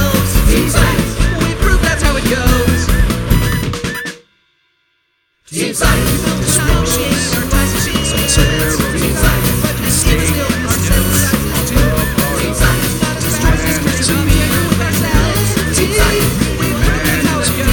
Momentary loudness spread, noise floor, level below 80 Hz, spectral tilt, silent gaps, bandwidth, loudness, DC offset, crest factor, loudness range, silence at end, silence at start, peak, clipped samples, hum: 3 LU; -62 dBFS; -18 dBFS; -4 dB/octave; none; 19.5 kHz; -13 LUFS; under 0.1%; 12 dB; 4 LU; 0 s; 0 s; 0 dBFS; under 0.1%; none